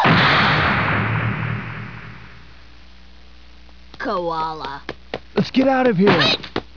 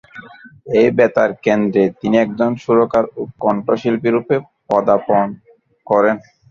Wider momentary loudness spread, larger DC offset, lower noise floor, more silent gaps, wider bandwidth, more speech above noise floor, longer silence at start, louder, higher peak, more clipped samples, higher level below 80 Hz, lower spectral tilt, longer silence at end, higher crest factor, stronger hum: first, 19 LU vs 7 LU; first, 0.8% vs under 0.1%; first, -46 dBFS vs -39 dBFS; neither; second, 5.4 kHz vs 7.2 kHz; about the same, 27 dB vs 24 dB; second, 0 s vs 0.15 s; about the same, -18 LUFS vs -16 LUFS; about the same, -2 dBFS vs -2 dBFS; neither; first, -42 dBFS vs -56 dBFS; about the same, -6.5 dB/octave vs -7.5 dB/octave; second, 0.15 s vs 0.3 s; about the same, 18 dB vs 16 dB; neither